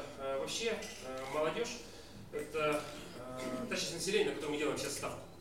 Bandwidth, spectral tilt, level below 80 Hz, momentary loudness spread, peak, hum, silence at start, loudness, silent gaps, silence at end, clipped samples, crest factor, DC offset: 16.5 kHz; -3 dB/octave; -62 dBFS; 12 LU; -20 dBFS; none; 0 s; -38 LUFS; none; 0 s; under 0.1%; 18 dB; 0.1%